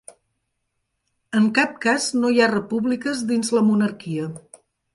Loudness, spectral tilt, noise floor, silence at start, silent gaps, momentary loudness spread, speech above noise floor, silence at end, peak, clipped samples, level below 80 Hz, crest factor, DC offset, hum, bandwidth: -21 LUFS; -4.5 dB/octave; -75 dBFS; 1.3 s; none; 11 LU; 55 dB; 0.55 s; -4 dBFS; under 0.1%; -66 dBFS; 18 dB; under 0.1%; none; 11.5 kHz